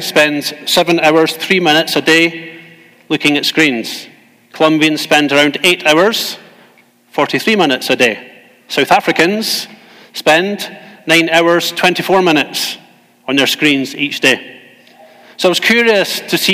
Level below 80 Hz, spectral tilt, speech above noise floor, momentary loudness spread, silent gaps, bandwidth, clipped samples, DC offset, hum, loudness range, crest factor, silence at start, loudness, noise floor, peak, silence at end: -60 dBFS; -3 dB/octave; 36 dB; 12 LU; none; 16.5 kHz; under 0.1%; under 0.1%; none; 2 LU; 14 dB; 0 s; -12 LUFS; -48 dBFS; 0 dBFS; 0 s